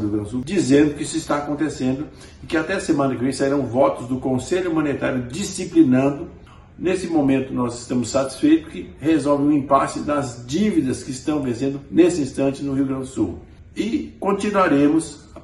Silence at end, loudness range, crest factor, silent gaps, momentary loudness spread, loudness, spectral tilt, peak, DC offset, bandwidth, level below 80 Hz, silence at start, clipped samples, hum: 0 s; 2 LU; 18 dB; none; 9 LU; -21 LUFS; -6 dB/octave; -2 dBFS; under 0.1%; 12 kHz; -46 dBFS; 0 s; under 0.1%; none